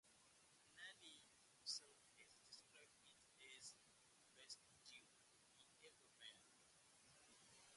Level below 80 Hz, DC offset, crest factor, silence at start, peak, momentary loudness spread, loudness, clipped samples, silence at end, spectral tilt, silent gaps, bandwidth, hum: under -90 dBFS; under 0.1%; 28 dB; 0.05 s; -36 dBFS; 16 LU; -61 LUFS; under 0.1%; 0 s; 0.5 dB/octave; none; 11.5 kHz; none